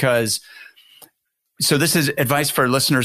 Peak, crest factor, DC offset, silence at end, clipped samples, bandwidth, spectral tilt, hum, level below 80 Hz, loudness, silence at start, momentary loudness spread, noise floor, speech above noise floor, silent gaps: -4 dBFS; 16 dB; under 0.1%; 0 s; under 0.1%; 15.5 kHz; -3.5 dB/octave; none; -56 dBFS; -18 LUFS; 0 s; 6 LU; -71 dBFS; 53 dB; none